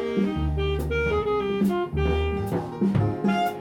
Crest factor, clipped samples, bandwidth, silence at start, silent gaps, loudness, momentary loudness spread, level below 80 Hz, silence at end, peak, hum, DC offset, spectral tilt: 14 dB; under 0.1%; 16.5 kHz; 0 s; none; -25 LUFS; 3 LU; -34 dBFS; 0 s; -10 dBFS; none; under 0.1%; -7.5 dB/octave